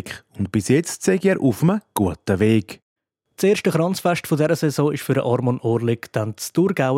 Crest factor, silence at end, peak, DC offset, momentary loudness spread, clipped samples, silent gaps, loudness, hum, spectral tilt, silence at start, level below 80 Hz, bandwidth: 16 dB; 0 s; -4 dBFS; under 0.1%; 6 LU; under 0.1%; 2.83-2.96 s; -20 LUFS; none; -6 dB/octave; 0.05 s; -58 dBFS; 16.5 kHz